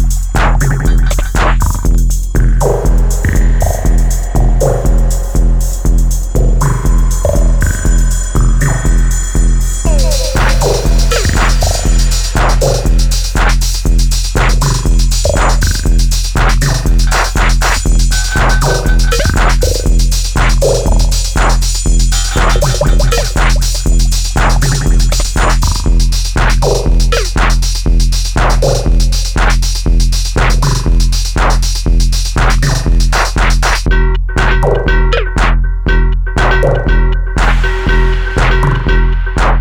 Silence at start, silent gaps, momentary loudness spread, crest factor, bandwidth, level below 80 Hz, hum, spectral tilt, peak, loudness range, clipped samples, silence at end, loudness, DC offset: 0 s; none; 2 LU; 8 dB; 16 kHz; -10 dBFS; none; -4.5 dB/octave; 0 dBFS; 1 LU; under 0.1%; 0 s; -12 LUFS; under 0.1%